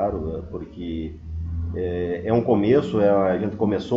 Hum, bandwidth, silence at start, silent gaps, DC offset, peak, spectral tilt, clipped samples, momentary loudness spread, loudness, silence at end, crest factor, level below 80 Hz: none; 7.8 kHz; 0 s; none; under 0.1%; -6 dBFS; -9 dB/octave; under 0.1%; 14 LU; -23 LUFS; 0 s; 16 dB; -38 dBFS